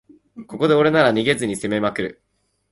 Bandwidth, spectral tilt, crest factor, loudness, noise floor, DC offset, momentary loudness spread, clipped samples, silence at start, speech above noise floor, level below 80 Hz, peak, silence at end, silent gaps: 12 kHz; -5 dB/octave; 18 dB; -19 LUFS; -41 dBFS; under 0.1%; 13 LU; under 0.1%; 0.35 s; 23 dB; -56 dBFS; -4 dBFS; 0.6 s; none